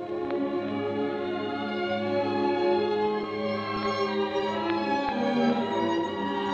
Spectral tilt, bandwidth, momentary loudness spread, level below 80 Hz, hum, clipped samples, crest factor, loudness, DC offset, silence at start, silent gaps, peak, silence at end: -6 dB/octave; 8 kHz; 5 LU; -64 dBFS; none; under 0.1%; 16 dB; -28 LUFS; under 0.1%; 0 s; none; -10 dBFS; 0 s